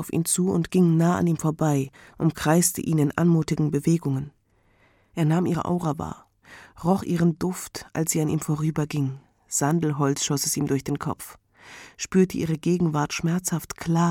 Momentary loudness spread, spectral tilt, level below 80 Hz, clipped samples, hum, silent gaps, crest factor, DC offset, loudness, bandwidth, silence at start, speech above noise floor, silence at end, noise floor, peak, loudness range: 11 LU; -5.5 dB/octave; -54 dBFS; under 0.1%; none; none; 18 dB; under 0.1%; -24 LUFS; 17 kHz; 0 s; 39 dB; 0 s; -62 dBFS; -6 dBFS; 4 LU